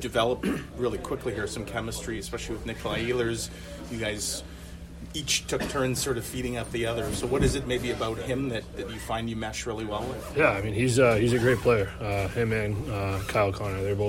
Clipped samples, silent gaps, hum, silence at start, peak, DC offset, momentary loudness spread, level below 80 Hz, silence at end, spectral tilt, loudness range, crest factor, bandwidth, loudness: under 0.1%; none; none; 0 s; -8 dBFS; under 0.1%; 11 LU; -42 dBFS; 0 s; -4.5 dB/octave; 6 LU; 20 dB; 16.5 kHz; -28 LUFS